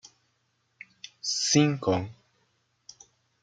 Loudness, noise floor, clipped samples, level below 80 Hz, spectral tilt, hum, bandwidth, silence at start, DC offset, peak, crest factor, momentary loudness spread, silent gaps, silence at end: -26 LUFS; -73 dBFS; under 0.1%; -68 dBFS; -4 dB/octave; none; 9.4 kHz; 1.25 s; under 0.1%; -8 dBFS; 22 dB; 22 LU; none; 1.3 s